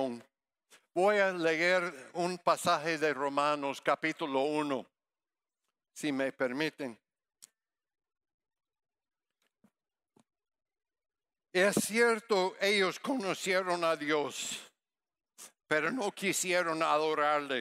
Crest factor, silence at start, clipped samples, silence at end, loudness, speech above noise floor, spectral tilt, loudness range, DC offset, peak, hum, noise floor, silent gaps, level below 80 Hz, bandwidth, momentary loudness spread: 20 dB; 0 s; under 0.1%; 0 s; -31 LUFS; over 59 dB; -3 dB/octave; 9 LU; under 0.1%; -12 dBFS; none; under -90 dBFS; 8.34-8.38 s; -84 dBFS; 16 kHz; 9 LU